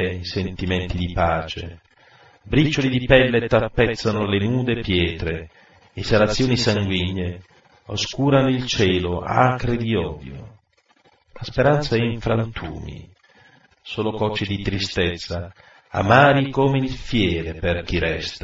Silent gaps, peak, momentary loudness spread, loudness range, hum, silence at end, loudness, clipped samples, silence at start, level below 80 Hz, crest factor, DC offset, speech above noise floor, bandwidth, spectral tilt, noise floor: none; 0 dBFS; 15 LU; 5 LU; none; 0.05 s; -21 LUFS; under 0.1%; 0 s; -38 dBFS; 22 dB; under 0.1%; 40 dB; 7.8 kHz; -6 dB/octave; -60 dBFS